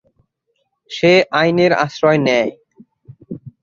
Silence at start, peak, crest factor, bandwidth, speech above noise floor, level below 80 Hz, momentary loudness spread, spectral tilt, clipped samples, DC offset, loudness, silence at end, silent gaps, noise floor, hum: 0.9 s; 0 dBFS; 16 dB; 7.4 kHz; 55 dB; -58 dBFS; 21 LU; -6 dB/octave; under 0.1%; under 0.1%; -14 LUFS; 0.15 s; none; -69 dBFS; none